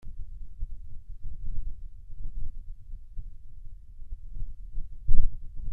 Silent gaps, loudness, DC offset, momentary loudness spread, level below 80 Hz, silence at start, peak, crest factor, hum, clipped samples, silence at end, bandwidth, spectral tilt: none; -42 LUFS; under 0.1%; 17 LU; -32 dBFS; 0.05 s; -2 dBFS; 20 dB; none; under 0.1%; 0 s; 0.4 kHz; -10 dB/octave